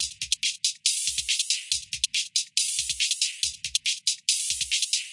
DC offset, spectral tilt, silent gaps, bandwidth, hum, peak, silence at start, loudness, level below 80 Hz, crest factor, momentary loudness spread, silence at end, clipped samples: under 0.1%; 5 dB/octave; none; 11.5 kHz; none; -8 dBFS; 0 s; -25 LUFS; -60 dBFS; 20 dB; 2 LU; 0 s; under 0.1%